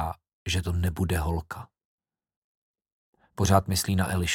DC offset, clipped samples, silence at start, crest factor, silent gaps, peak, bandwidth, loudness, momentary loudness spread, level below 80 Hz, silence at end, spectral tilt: under 0.1%; under 0.1%; 0 s; 24 dB; 0.33-0.46 s, 1.85-1.98 s, 2.36-2.74 s, 2.92-3.13 s; -4 dBFS; 17 kHz; -27 LUFS; 17 LU; -42 dBFS; 0 s; -5 dB/octave